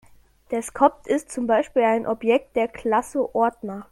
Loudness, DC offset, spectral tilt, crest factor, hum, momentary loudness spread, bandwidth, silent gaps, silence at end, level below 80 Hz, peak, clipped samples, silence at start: -23 LUFS; under 0.1%; -5 dB/octave; 20 dB; none; 8 LU; 13.5 kHz; none; 0.1 s; -56 dBFS; -4 dBFS; under 0.1%; 0.5 s